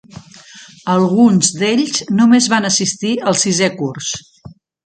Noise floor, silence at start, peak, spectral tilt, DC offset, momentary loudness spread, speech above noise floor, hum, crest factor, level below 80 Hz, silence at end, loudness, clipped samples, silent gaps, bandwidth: -40 dBFS; 0.15 s; 0 dBFS; -4 dB/octave; under 0.1%; 11 LU; 26 dB; none; 16 dB; -56 dBFS; 0.35 s; -14 LUFS; under 0.1%; none; 9.4 kHz